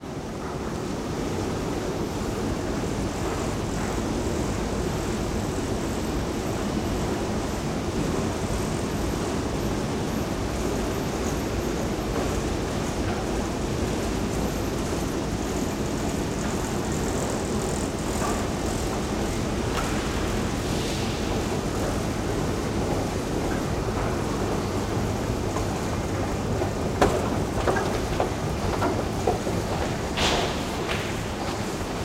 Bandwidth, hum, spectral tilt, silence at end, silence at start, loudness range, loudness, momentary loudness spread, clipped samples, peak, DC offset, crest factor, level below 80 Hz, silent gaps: 16 kHz; none; -5 dB/octave; 0 s; 0 s; 2 LU; -27 LUFS; 3 LU; under 0.1%; -6 dBFS; under 0.1%; 20 dB; -36 dBFS; none